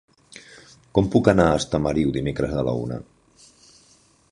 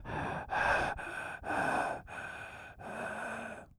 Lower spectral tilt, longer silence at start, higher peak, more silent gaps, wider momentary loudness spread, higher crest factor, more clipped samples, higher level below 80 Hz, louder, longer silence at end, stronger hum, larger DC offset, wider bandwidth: first, -6.5 dB/octave vs -4.5 dB/octave; first, 0.35 s vs 0 s; first, -2 dBFS vs -18 dBFS; neither; about the same, 16 LU vs 14 LU; about the same, 22 dB vs 20 dB; neither; first, -42 dBFS vs -56 dBFS; first, -21 LUFS vs -36 LUFS; first, 1.3 s vs 0.1 s; neither; neither; second, 11.5 kHz vs over 20 kHz